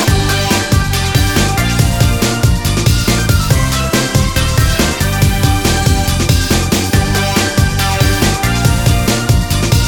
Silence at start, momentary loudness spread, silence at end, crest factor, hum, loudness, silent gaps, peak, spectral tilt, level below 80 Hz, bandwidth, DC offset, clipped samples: 0 s; 1 LU; 0 s; 12 dB; none; -12 LUFS; none; 0 dBFS; -4.5 dB/octave; -18 dBFS; 18 kHz; 0.5%; under 0.1%